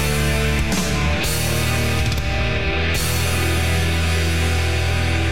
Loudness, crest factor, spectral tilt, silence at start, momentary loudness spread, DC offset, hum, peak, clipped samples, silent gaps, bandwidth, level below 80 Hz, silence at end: -20 LUFS; 10 dB; -4.5 dB/octave; 0 s; 1 LU; 4%; none; -8 dBFS; under 0.1%; none; 17 kHz; -26 dBFS; 0 s